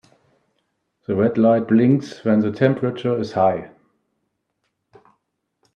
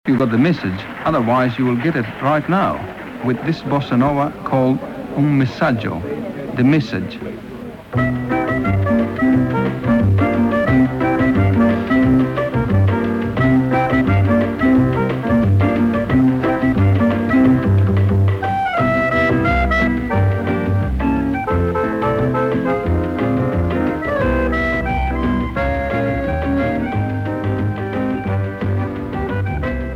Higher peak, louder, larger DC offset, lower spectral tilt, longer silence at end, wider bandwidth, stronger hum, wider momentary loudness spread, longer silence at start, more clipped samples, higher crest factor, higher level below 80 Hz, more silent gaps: about the same, -2 dBFS vs -4 dBFS; about the same, -19 LUFS vs -17 LUFS; neither; about the same, -8.5 dB/octave vs -9 dB/octave; first, 2.1 s vs 0 s; about the same, 7 kHz vs 6.8 kHz; neither; about the same, 8 LU vs 7 LU; first, 1.1 s vs 0.05 s; neither; about the same, 18 dB vs 14 dB; second, -64 dBFS vs -32 dBFS; neither